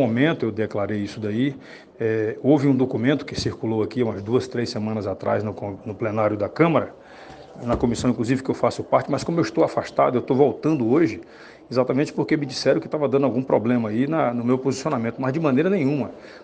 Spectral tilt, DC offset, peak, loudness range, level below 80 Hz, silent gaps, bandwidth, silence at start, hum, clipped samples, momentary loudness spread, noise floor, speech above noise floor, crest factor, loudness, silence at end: -7 dB/octave; under 0.1%; -4 dBFS; 3 LU; -52 dBFS; none; 9.4 kHz; 0 s; none; under 0.1%; 7 LU; -43 dBFS; 21 dB; 18 dB; -22 LUFS; 0 s